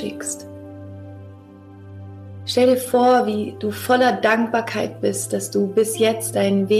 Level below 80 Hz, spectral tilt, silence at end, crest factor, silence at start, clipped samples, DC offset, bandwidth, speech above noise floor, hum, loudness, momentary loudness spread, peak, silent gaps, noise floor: -64 dBFS; -4.5 dB/octave; 0 s; 14 dB; 0 s; under 0.1%; under 0.1%; 15 kHz; 23 dB; none; -19 LUFS; 22 LU; -6 dBFS; none; -42 dBFS